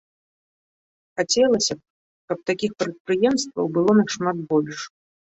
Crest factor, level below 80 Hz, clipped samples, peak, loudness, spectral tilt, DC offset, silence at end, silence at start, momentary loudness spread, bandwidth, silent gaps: 18 dB; -64 dBFS; under 0.1%; -6 dBFS; -22 LUFS; -4 dB/octave; under 0.1%; 0.5 s; 1.15 s; 14 LU; 8.2 kHz; 1.90-2.28 s, 3.00-3.05 s